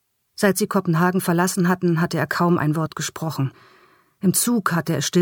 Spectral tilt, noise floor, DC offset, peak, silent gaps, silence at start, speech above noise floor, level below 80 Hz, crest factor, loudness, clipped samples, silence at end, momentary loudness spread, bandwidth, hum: -5 dB/octave; -55 dBFS; under 0.1%; -4 dBFS; none; 0.4 s; 35 dB; -62 dBFS; 16 dB; -21 LUFS; under 0.1%; 0 s; 7 LU; 19 kHz; none